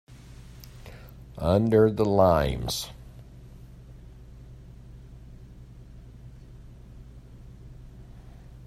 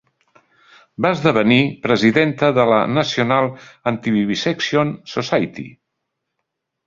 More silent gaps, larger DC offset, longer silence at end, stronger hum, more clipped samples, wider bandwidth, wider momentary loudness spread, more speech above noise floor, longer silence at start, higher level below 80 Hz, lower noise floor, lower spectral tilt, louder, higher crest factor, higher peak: neither; neither; second, 0 s vs 1.15 s; neither; neither; first, 15.5 kHz vs 7.6 kHz; first, 28 LU vs 10 LU; second, 24 dB vs 60 dB; second, 0.1 s vs 1 s; first, -44 dBFS vs -56 dBFS; second, -46 dBFS vs -77 dBFS; about the same, -6.5 dB/octave vs -6 dB/octave; second, -23 LUFS vs -17 LUFS; first, 24 dB vs 18 dB; second, -6 dBFS vs 0 dBFS